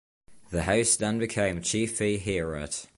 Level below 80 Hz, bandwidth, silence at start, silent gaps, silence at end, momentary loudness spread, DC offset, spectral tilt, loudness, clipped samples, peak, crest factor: -46 dBFS; 11.5 kHz; 0.3 s; none; 0.1 s; 9 LU; under 0.1%; -3.5 dB/octave; -27 LUFS; under 0.1%; -10 dBFS; 20 dB